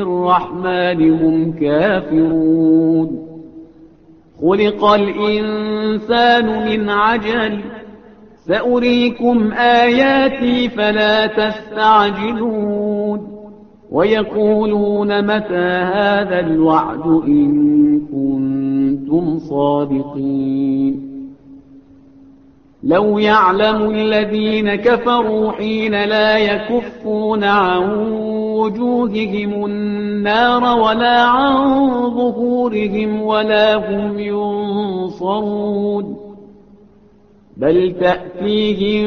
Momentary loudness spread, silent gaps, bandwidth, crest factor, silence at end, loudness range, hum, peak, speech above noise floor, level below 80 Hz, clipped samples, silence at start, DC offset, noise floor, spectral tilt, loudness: 8 LU; none; 6.4 kHz; 14 dB; 0 s; 5 LU; none; 0 dBFS; 33 dB; -48 dBFS; under 0.1%; 0 s; 0.1%; -48 dBFS; -7.5 dB/octave; -15 LUFS